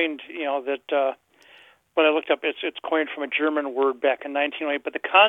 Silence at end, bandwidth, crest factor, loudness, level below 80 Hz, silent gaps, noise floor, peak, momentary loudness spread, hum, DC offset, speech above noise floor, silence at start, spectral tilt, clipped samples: 0 s; 4 kHz; 22 dB; -24 LUFS; -76 dBFS; none; -53 dBFS; -2 dBFS; 7 LU; none; under 0.1%; 30 dB; 0 s; -4.5 dB/octave; under 0.1%